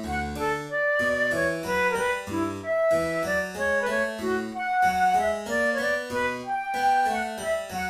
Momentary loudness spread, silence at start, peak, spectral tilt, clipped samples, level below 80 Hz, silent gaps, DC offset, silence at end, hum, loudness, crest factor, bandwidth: 6 LU; 0 s; -12 dBFS; -4 dB/octave; under 0.1%; -50 dBFS; none; under 0.1%; 0 s; none; -25 LUFS; 14 dB; 15.5 kHz